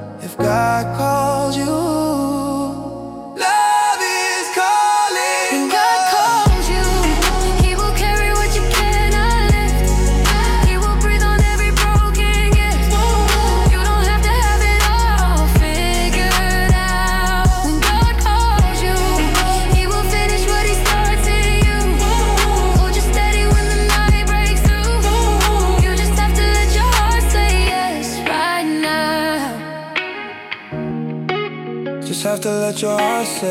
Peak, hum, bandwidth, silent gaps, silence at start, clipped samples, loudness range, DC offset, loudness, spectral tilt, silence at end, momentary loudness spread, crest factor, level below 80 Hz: -4 dBFS; none; 16 kHz; none; 0 s; under 0.1%; 4 LU; under 0.1%; -16 LUFS; -4.5 dB/octave; 0 s; 7 LU; 10 dB; -18 dBFS